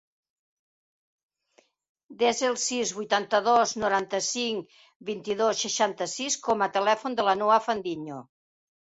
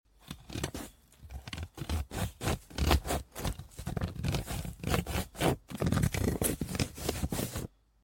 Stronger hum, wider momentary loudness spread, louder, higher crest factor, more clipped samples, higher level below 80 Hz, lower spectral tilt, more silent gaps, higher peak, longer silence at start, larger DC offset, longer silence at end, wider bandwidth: neither; about the same, 12 LU vs 13 LU; first, -26 LUFS vs -34 LUFS; second, 20 dB vs 26 dB; neither; second, -70 dBFS vs -40 dBFS; second, -2 dB/octave vs -5 dB/octave; first, 4.96-5.00 s vs none; about the same, -8 dBFS vs -8 dBFS; first, 2.1 s vs 0.25 s; neither; first, 0.6 s vs 0.35 s; second, 8.4 kHz vs 17 kHz